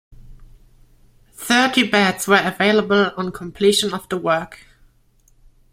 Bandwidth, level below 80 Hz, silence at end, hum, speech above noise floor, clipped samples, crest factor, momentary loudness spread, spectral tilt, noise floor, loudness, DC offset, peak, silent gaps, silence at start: 16 kHz; -50 dBFS; 1.15 s; none; 38 dB; under 0.1%; 20 dB; 11 LU; -3.5 dB/octave; -56 dBFS; -17 LUFS; under 0.1%; 0 dBFS; none; 0.3 s